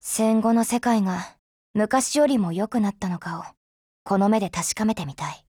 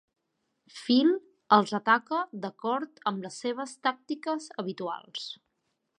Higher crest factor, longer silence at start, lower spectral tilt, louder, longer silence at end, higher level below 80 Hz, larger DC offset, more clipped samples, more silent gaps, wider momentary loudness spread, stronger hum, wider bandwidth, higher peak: second, 16 dB vs 22 dB; second, 0.05 s vs 0.75 s; about the same, -5 dB/octave vs -4.5 dB/octave; first, -23 LUFS vs -29 LUFS; second, 0.15 s vs 0.65 s; first, -58 dBFS vs -86 dBFS; neither; neither; first, 1.39-1.74 s, 3.57-4.05 s vs none; second, 12 LU vs 15 LU; neither; first, 18.5 kHz vs 11 kHz; about the same, -8 dBFS vs -8 dBFS